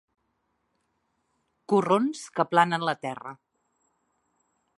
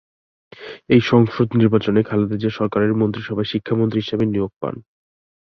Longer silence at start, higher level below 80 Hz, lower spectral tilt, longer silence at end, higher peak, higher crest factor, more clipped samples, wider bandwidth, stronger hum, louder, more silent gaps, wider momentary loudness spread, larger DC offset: first, 1.7 s vs 0.6 s; second, -80 dBFS vs -50 dBFS; second, -5.5 dB/octave vs -8.5 dB/octave; first, 1.45 s vs 0.7 s; second, -6 dBFS vs -2 dBFS; first, 24 dB vs 18 dB; neither; first, 11.5 kHz vs 6.4 kHz; neither; second, -25 LUFS vs -19 LUFS; second, none vs 4.56-4.61 s; about the same, 14 LU vs 13 LU; neither